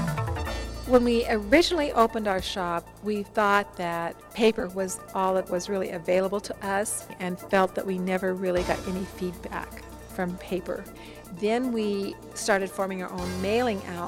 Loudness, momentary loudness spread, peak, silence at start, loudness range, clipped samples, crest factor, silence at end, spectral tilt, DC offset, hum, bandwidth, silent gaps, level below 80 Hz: -27 LUFS; 11 LU; -4 dBFS; 0 s; 6 LU; under 0.1%; 22 dB; 0 s; -4.5 dB/octave; under 0.1%; none; 17 kHz; none; -46 dBFS